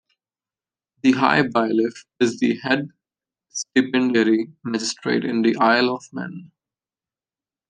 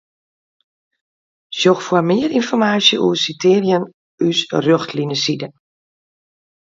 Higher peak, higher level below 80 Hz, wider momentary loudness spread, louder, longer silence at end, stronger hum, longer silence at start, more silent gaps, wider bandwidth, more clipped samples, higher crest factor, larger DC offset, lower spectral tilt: about the same, -2 dBFS vs 0 dBFS; about the same, -68 dBFS vs -64 dBFS; first, 14 LU vs 8 LU; second, -20 LUFS vs -16 LUFS; about the same, 1.25 s vs 1.15 s; neither; second, 1.05 s vs 1.5 s; second, none vs 3.94-4.18 s; first, 9.8 kHz vs 7.8 kHz; neither; about the same, 20 dB vs 18 dB; neither; about the same, -4.5 dB/octave vs -4.5 dB/octave